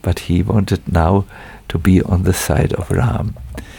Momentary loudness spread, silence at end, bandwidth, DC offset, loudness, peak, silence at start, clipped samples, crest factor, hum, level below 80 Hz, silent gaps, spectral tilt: 11 LU; 0 s; 18.5 kHz; under 0.1%; -16 LUFS; -2 dBFS; 0.05 s; under 0.1%; 14 dB; none; -28 dBFS; none; -6.5 dB/octave